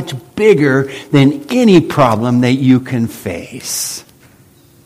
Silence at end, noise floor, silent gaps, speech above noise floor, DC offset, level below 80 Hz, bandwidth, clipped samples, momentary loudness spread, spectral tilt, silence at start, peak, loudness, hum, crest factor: 0.85 s; -46 dBFS; none; 33 dB; under 0.1%; -48 dBFS; 16 kHz; 0.1%; 14 LU; -6 dB/octave; 0 s; 0 dBFS; -12 LUFS; none; 14 dB